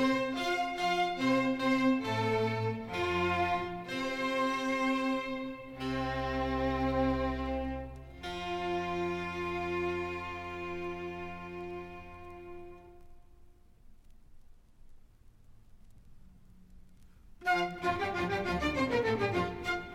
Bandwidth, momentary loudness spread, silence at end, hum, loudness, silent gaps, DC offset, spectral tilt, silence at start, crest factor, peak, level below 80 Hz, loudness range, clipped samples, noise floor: 15.5 kHz; 13 LU; 0 s; none; -33 LUFS; none; under 0.1%; -5.5 dB/octave; 0 s; 16 dB; -18 dBFS; -50 dBFS; 14 LU; under 0.1%; -57 dBFS